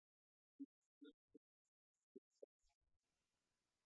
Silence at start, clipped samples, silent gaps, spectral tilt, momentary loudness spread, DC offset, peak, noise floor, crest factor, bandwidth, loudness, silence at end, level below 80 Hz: 0.6 s; under 0.1%; 0.65-1.01 s, 1.14-1.28 s, 1.37-1.94 s, 2.03-2.15 s; -4.5 dB/octave; 8 LU; under 0.1%; -46 dBFS; under -90 dBFS; 22 dB; 7.4 kHz; -66 LUFS; 1.65 s; under -90 dBFS